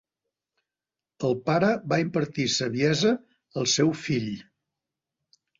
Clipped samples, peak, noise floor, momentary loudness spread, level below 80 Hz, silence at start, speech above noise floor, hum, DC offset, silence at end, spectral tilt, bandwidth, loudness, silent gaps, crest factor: under 0.1%; -10 dBFS; under -90 dBFS; 9 LU; -64 dBFS; 1.2 s; over 65 dB; none; under 0.1%; 1.15 s; -4.5 dB/octave; 7.8 kHz; -25 LUFS; none; 18 dB